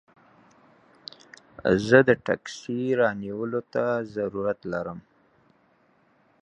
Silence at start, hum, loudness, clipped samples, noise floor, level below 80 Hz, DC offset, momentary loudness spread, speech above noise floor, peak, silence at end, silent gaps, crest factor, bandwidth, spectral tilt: 1.6 s; none; -25 LUFS; under 0.1%; -63 dBFS; -60 dBFS; under 0.1%; 25 LU; 39 dB; -4 dBFS; 1.45 s; none; 24 dB; 9.4 kHz; -6.5 dB/octave